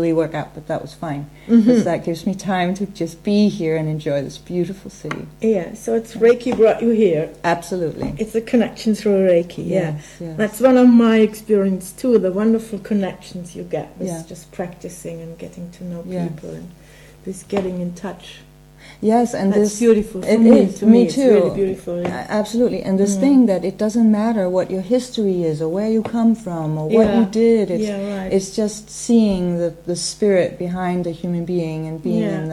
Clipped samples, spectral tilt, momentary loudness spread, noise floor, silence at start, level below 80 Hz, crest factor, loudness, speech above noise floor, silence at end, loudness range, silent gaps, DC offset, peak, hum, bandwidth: under 0.1%; -6.5 dB/octave; 16 LU; -43 dBFS; 0 s; -48 dBFS; 18 dB; -18 LUFS; 26 dB; 0 s; 13 LU; none; under 0.1%; 0 dBFS; none; 13 kHz